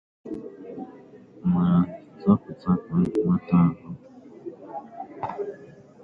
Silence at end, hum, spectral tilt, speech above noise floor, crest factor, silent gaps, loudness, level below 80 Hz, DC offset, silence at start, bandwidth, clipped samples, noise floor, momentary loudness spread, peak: 0.35 s; none; -11 dB/octave; 26 dB; 20 dB; none; -24 LUFS; -52 dBFS; under 0.1%; 0.25 s; 4.8 kHz; under 0.1%; -48 dBFS; 20 LU; -6 dBFS